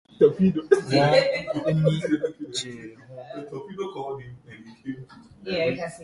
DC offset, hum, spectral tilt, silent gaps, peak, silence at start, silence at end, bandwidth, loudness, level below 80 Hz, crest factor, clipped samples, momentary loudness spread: under 0.1%; none; -6 dB/octave; none; -2 dBFS; 0.2 s; 0 s; 11.5 kHz; -23 LUFS; -58 dBFS; 22 dB; under 0.1%; 21 LU